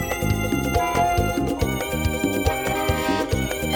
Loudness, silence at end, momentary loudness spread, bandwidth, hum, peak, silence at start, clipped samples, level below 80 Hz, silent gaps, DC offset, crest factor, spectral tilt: -23 LUFS; 0 s; 3 LU; over 20 kHz; none; -6 dBFS; 0 s; under 0.1%; -32 dBFS; none; under 0.1%; 16 dB; -5 dB/octave